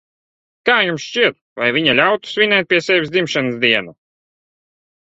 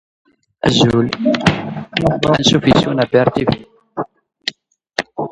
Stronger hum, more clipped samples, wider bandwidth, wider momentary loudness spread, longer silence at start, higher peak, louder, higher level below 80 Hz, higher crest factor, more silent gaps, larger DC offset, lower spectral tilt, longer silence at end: neither; neither; second, 8 kHz vs 11 kHz; second, 5 LU vs 14 LU; about the same, 0.65 s vs 0.65 s; about the same, 0 dBFS vs 0 dBFS; about the same, -15 LUFS vs -15 LUFS; second, -60 dBFS vs -42 dBFS; about the same, 18 dB vs 16 dB; first, 1.41-1.56 s vs none; neither; second, -4 dB/octave vs -5.5 dB/octave; first, 1.2 s vs 0 s